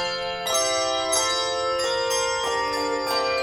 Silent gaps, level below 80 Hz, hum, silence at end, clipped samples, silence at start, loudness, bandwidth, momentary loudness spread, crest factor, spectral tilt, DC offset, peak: none; -54 dBFS; none; 0 s; under 0.1%; 0 s; -23 LUFS; 19.5 kHz; 3 LU; 14 dB; -0.5 dB/octave; under 0.1%; -10 dBFS